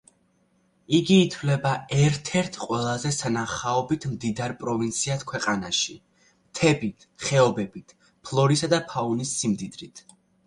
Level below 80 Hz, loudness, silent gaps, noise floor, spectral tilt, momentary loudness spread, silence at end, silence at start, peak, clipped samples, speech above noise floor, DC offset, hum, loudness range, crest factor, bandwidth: -58 dBFS; -25 LUFS; none; -66 dBFS; -5 dB/octave; 10 LU; 0.5 s; 0.9 s; -6 dBFS; under 0.1%; 41 dB; under 0.1%; none; 3 LU; 20 dB; 11.5 kHz